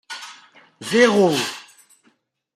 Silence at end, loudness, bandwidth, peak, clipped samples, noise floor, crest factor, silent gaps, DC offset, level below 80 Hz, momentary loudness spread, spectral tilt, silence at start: 0.95 s; -18 LUFS; 16 kHz; -2 dBFS; under 0.1%; -63 dBFS; 20 dB; none; under 0.1%; -68 dBFS; 22 LU; -4 dB/octave; 0.1 s